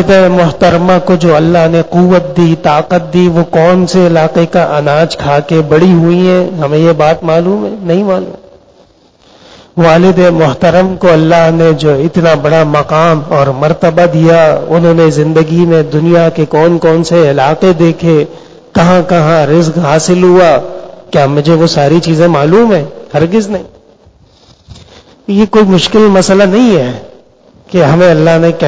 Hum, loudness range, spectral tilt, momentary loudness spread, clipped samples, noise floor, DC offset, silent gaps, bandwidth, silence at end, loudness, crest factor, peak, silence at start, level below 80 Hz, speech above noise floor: none; 3 LU; -7 dB/octave; 6 LU; 2%; -44 dBFS; under 0.1%; none; 8 kHz; 0 s; -7 LUFS; 8 dB; 0 dBFS; 0 s; -38 dBFS; 37 dB